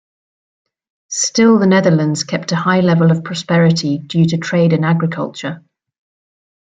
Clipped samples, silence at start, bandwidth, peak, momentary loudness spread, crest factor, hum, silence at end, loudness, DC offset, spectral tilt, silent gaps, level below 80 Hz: under 0.1%; 1.1 s; 9.2 kHz; -2 dBFS; 12 LU; 14 dB; none; 1.15 s; -14 LUFS; under 0.1%; -5.5 dB/octave; none; -58 dBFS